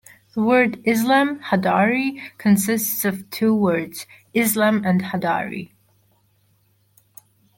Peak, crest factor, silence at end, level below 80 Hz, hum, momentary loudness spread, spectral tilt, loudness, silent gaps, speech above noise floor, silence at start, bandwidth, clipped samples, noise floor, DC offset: -4 dBFS; 18 dB; 1.95 s; -64 dBFS; none; 9 LU; -5 dB/octave; -20 LUFS; none; 42 dB; 0.35 s; 17 kHz; under 0.1%; -62 dBFS; under 0.1%